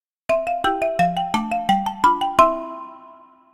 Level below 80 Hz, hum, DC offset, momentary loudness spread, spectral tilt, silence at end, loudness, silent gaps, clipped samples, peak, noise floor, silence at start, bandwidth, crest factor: -48 dBFS; none; under 0.1%; 13 LU; -5 dB/octave; 0.4 s; -20 LUFS; none; under 0.1%; 0 dBFS; -47 dBFS; 0.3 s; 17.5 kHz; 20 dB